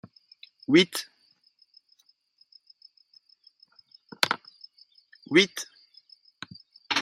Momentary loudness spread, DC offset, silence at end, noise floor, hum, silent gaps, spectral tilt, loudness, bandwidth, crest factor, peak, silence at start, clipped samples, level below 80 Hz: 28 LU; under 0.1%; 0 s; -66 dBFS; none; none; -3.5 dB/octave; -24 LUFS; 14 kHz; 30 dB; -2 dBFS; 0.7 s; under 0.1%; -76 dBFS